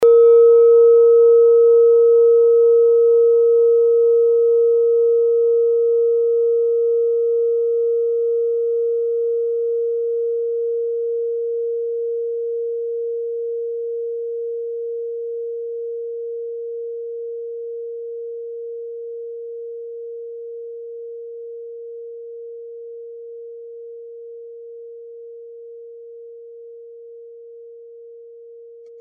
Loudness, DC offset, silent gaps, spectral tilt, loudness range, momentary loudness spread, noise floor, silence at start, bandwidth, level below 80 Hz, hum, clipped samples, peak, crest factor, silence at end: -16 LUFS; under 0.1%; none; -1 dB/octave; 24 LU; 24 LU; -40 dBFS; 0 s; 1.4 kHz; -76 dBFS; none; under 0.1%; -6 dBFS; 12 dB; 0 s